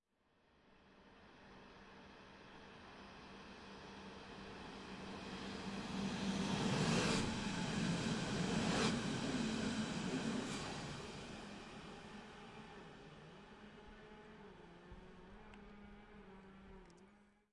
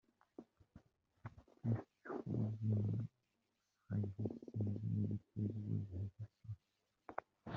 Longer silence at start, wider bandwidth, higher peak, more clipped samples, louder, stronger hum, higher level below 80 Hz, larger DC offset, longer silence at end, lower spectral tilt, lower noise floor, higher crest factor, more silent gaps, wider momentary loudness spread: first, 0.65 s vs 0.4 s; first, 11.5 kHz vs 3.1 kHz; about the same, -24 dBFS vs -24 dBFS; neither; about the same, -42 LUFS vs -44 LUFS; neither; first, -64 dBFS vs -74 dBFS; neither; first, 0.25 s vs 0 s; second, -4.5 dB/octave vs -10.5 dB/octave; second, -77 dBFS vs -86 dBFS; about the same, 22 dB vs 20 dB; neither; first, 21 LU vs 18 LU